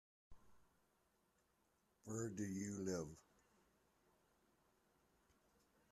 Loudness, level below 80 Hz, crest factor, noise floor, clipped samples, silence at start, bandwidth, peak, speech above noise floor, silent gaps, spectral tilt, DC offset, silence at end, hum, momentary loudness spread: -48 LUFS; -80 dBFS; 22 dB; -82 dBFS; under 0.1%; 0.3 s; 13.5 kHz; -32 dBFS; 35 dB; none; -5.5 dB/octave; under 0.1%; 2.7 s; none; 15 LU